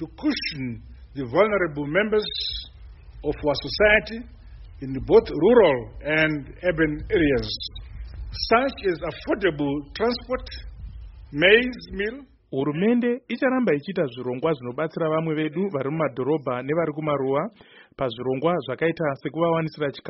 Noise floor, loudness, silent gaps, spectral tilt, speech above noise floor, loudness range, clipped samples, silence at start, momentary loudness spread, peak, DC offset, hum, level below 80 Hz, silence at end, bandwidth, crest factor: -43 dBFS; -23 LUFS; none; -4 dB/octave; 19 dB; 5 LU; under 0.1%; 0 s; 16 LU; -2 dBFS; under 0.1%; none; -44 dBFS; 0 s; 6 kHz; 22 dB